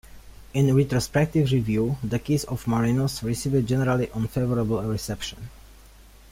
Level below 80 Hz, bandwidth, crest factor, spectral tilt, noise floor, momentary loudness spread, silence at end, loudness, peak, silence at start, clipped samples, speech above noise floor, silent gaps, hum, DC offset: -44 dBFS; 16 kHz; 16 dB; -6.5 dB/octave; -49 dBFS; 9 LU; 0.6 s; -24 LUFS; -8 dBFS; 0.05 s; under 0.1%; 26 dB; none; none; under 0.1%